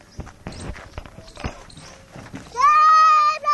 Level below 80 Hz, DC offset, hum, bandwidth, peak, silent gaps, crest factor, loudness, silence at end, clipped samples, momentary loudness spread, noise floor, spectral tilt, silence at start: -44 dBFS; under 0.1%; none; 11 kHz; -6 dBFS; none; 14 dB; -14 LUFS; 0 s; under 0.1%; 26 LU; -43 dBFS; -3 dB/octave; 0.2 s